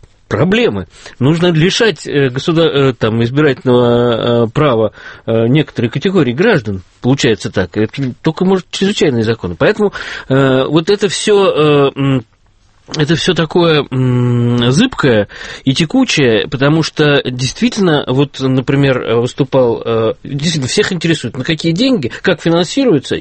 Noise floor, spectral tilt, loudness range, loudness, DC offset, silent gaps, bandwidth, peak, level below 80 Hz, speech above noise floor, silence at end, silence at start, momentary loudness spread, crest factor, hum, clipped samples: -49 dBFS; -5.5 dB/octave; 2 LU; -13 LUFS; under 0.1%; none; 8.8 kHz; 0 dBFS; -42 dBFS; 37 dB; 0 s; 0.3 s; 6 LU; 12 dB; none; under 0.1%